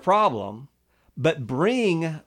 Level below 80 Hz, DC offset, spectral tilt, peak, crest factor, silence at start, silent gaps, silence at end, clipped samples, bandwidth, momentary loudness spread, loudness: -62 dBFS; under 0.1%; -6.5 dB/octave; -8 dBFS; 16 dB; 0.05 s; none; 0.05 s; under 0.1%; 11.5 kHz; 18 LU; -23 LUFS